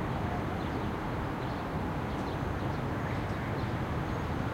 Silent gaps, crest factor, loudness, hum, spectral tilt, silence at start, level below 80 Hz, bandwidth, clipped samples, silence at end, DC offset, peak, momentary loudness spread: none; 14 dB; -34 LUFS; none; -7.5 dB/octave; 0 s; -44 dBFS; 16.5 kHz; under 0.1%; 0 s; under 0.1%; -20 dBFS; 1 LU